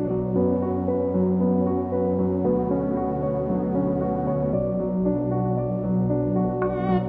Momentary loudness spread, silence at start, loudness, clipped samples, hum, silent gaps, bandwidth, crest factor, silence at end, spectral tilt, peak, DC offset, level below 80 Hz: 3 LU; 0 s; -24 LUFS; under 0.1%; none; none; 3.8 kHz; 12 dB; 0 s; -12.5 dB/octave; -10 dBFS; under 0.1%; -44 dBFS